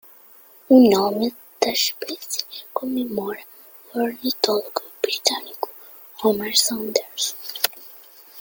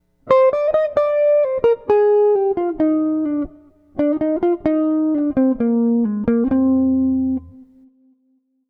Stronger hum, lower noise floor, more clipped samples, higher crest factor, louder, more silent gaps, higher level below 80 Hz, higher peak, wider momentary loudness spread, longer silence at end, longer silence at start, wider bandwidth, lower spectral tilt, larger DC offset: neither; second, -49 dBFS vs -63 dBFS; neither; first, 22 dB vs 16 dB; second, -21 LUFS vs -17 LUFS; neither; second, -66 dBFS vs -48 dBFS; about the same, 0 dBFS vs -2 dBFS; first, 16 LU vs 6 LU; second, 0 s vs 1.05 s; first, 0.7 s vs 0.25 s; first, 17 kHz vs 5.4 kHz; second, -2.5 dB/octave vs -9.5 dB/octave; neither